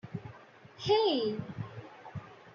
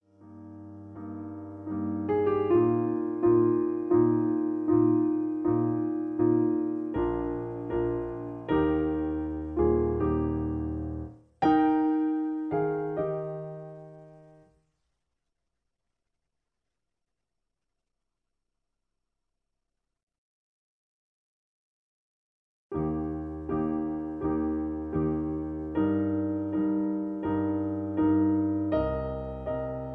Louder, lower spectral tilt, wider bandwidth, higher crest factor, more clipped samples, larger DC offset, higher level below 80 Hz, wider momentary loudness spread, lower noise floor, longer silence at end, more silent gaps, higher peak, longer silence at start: second, -31 LUFS vs -28 LUFS; second, -4 dB/octave vs -11 dB/octave; first, 7.2 kHz vs 4 kHz; about the same, 20 dB vs 16 dB; neither; neither; second, -68 dBFS vs -48 dBFS; first, 21 LU vs 13 LU; second, -54 dBFS vs -86 dBFS; about the same, 0 s vs 0 s; second, none vs 20.03-20.07 s, 20.18-22.70 s; about the same, -14 dBFS vs -14 dBFS; second, 0.05 s vs 0.2 s